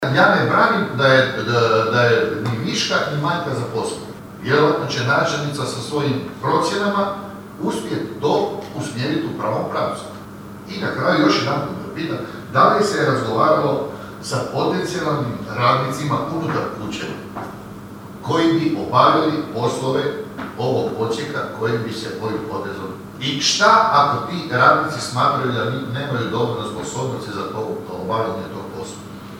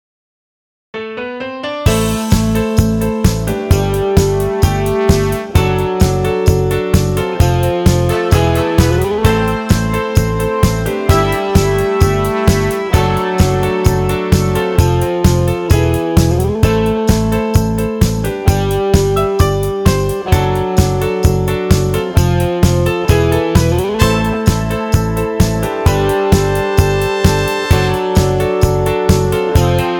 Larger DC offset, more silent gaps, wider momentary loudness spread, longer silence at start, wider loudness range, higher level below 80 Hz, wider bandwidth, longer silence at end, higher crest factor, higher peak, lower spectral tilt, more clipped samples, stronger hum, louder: neither; neither; first, 16 LU vs 2 LU; second, 0 s vs 0.95 s; first, 6 LU vs 1 LU; second, -54 dBFS vs -22 dBFS; second, 17 kHz vs 19.5 kHz; about the same, 0 s vs 0 s; first, 20 dB vs 12 dB; about the same, 0 dBFS vs 0 dBFS; about the same, -5 dB/octave vs -6 dB/octave; neither; neither; second, -19 LUFS vs -14 LUFS